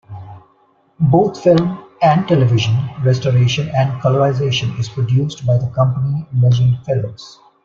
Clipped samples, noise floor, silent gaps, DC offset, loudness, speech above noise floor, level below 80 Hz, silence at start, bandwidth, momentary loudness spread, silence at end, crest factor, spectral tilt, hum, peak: under 0.1%; -56 dBFS; none; under 0.1%; -16 LUFS; 41 dB; -48 dBFS; 0.1 s; 7.2 kHz; 8 LU; 0.35 s; 14 dB; -7 dB/octave; none; -2 dBFS